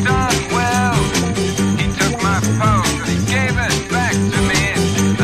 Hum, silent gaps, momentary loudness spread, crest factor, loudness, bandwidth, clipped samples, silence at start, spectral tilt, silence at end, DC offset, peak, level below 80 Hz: none; none; 2 LU; 14 dB; -16 LUFS; 15.5 kHz; under 0.1%; 0 s; -4.5 dB/octave; 0 s; under 0.1%; -2 dBFS; -30 dBFS